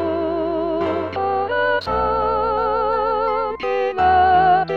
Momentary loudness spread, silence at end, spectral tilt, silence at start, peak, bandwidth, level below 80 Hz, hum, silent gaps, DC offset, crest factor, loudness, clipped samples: 8 LU; 0 s; -7 dB/octave; 0 s; -4 dBFS; 6.4 kHz; -42 dBFS; none; none; 0.5%; 14 dB; -19 LUFS; under 0.1%